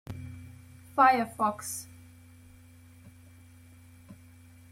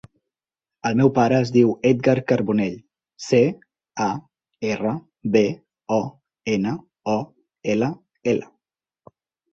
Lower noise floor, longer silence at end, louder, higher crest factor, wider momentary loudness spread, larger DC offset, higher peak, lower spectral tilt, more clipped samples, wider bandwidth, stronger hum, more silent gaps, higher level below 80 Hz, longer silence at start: second, -54 dBFS vs -90 dBFS; second, 0.55 s vs 1.1 s; second, -27 LUFS vs -22 LUFS; about the same, 24 dB vs 20 dB; first, 27 LU vs 16 LU; neither; second, -10 dBFS vs -4 dBFS; second, -4 dB/octave vs -7 dB/octave; neither; first, 16.5 kHz vs 7.8 kHz; neither; neither; second, -66 dBFS vs -60 dBFS; second, 0.1 s vs 0.85 s